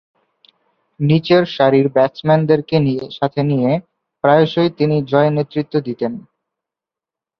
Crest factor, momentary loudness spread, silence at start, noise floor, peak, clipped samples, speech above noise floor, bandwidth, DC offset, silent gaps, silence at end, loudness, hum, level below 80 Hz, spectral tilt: 16 dB; 9 LU; 1 s; -87 dBFS; -2 dBFS; under 0.1%; 72 dB; 6 kHz; under 0.1%; none; 1.2 s; -16 LUFS; none; -58 dBFS; -9 dB/octave